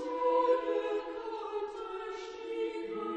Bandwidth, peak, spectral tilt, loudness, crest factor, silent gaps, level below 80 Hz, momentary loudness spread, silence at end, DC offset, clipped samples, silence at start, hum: 8.4 kHz; -18 dBFS; -4.5 dB/octave; -34 LUFS; 16 dB; none; -68 dBFS; 12 LU; 0 s; under 0.1%; under 0.1%; 0 s; none